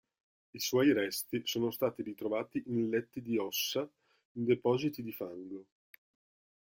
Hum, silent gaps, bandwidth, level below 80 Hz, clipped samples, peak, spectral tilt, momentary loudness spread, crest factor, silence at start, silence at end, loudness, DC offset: none; 4.25-4.35 s; 17 kHz; -74 dBFS; under 0.1%; -16 dBFS; -4.5 dB/octave; 16 LU; 18 dB; 0.55 s; 1 s; -34 LUFS; under 0.1%